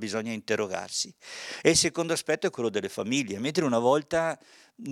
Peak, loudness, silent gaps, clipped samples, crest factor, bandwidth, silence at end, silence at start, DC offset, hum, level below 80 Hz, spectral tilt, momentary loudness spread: -4 dBFS; -27 LUFS; none; under 0.1%; 24 dB; 16 kHz; 0 s; 0 s; under 0.1%; none; -62 dBFS; -3.5 dB/octave; 11 LU